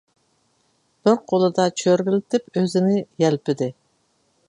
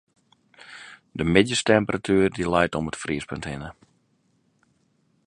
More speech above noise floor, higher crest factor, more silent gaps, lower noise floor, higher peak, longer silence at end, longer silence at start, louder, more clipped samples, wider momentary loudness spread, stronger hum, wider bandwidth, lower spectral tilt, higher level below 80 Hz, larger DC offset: about the same, 46 dB vs 44 dB; second, 18 dB vs 24 dB; neither; about the same, -66 dBFS vs -67 dBFS; about the same, -2 dBFS vs -2 dBFS; second, 0.75 s vs 1.55 s; first, 1.05 s vs 0.7 s; about the same, -21 LUFS vs -23 LUFS; neither; second, 5 LU vs 22 LU; neither; about the same, 11 kHz vs 11.5 kHz; about the same, -6 dB/octave vs -5 dB/octave; second, -68 dBFS vs -48 dBFS; neither